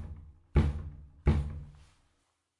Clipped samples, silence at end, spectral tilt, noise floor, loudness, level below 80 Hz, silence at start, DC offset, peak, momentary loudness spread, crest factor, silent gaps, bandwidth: under 0.1%; 0.9 s; -9 dB/octave; -76 dBFS; -32 LUFS; -38 dBFS; 0 s; under 0.1%; -14 dBFS; 19 LU; 20 dB; none; 10 kHz